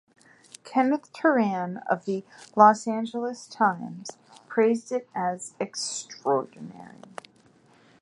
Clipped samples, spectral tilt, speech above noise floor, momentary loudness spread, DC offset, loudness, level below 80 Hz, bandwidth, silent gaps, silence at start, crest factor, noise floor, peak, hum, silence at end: under 0.1%; -4.5 dB/octave; 33 dB; 23 LU; under 0.1%; -26 LUFS; -78 dBFS; 11.5 kHz; none; 0.65 s; 22 dB; -59 dBFS; -4 dBFS; none; 1.1 s